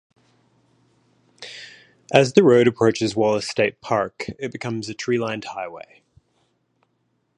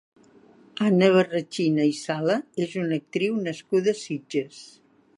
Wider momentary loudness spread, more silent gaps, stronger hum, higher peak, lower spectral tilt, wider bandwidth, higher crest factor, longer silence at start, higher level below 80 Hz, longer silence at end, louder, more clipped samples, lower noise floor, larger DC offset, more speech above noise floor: first, 22 LU vs 11 LU; neither; neither; first, 0 dBFS vs -6 dBFS; about the same, -5.5 dB/octave vs -6 dB/octave; about the same, 11 kHz vs 11.5 kHz; about the same, 22 dB vs 20 dB; first, 1.4 s vs 0.75 s; first, -60 dBFS vs -72 dBFS; first, 1.6 s vs 0.5 s; first, -20 LUFS vs -24 LUFS; neither; first, -70 dBFS vs -54 dBFS; neither; first, 50 dB vs 30 dB